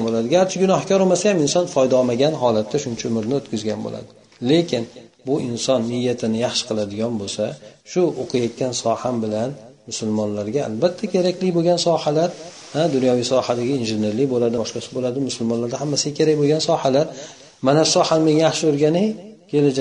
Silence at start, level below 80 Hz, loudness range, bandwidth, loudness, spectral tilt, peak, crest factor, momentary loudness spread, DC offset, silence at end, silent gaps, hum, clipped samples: 0 s; -60 dBFS; 5 LU; 10 kHz; -20 LUFS; -5 dB/octave; -2 dBFS; 18 dB; 9 LU; under 0.1%; 0 s; none; none; under 0.1%